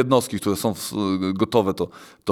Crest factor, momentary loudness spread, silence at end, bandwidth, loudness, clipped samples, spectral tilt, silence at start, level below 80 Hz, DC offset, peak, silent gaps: 18 dB; 9 LU; 0 s; 19.5 kHz; -23 LUFS; under 0.1%; -5.5 dB/octave; 0 s; -56 dBFS; under 0.1%; -4 dBFS; none